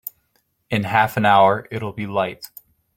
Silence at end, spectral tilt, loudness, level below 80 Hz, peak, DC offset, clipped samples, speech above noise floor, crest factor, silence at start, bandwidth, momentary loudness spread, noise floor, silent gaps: 0.5 s; -6 dB/octave; -19 LUFS; -58 dBFS; -2 dBFS; under 0.1%; under 0.1%; 48 dB; 18 dB; 0.7 s; 17 kHz; 20 LU; -67 dBFS; none